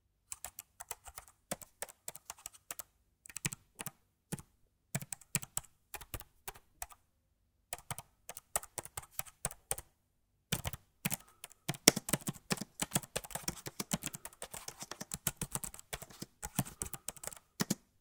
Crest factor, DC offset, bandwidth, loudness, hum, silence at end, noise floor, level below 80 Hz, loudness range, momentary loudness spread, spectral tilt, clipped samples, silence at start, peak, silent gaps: 42 dB; under 0.1%; 19 kHz; -40 LUFS; none; 0.25 s; -77 dBFS; -62 dBFS; 11 LU; 12 LU; -2.5 dB/octave; under 0.1%; 0.3 s; 0 dBFS; none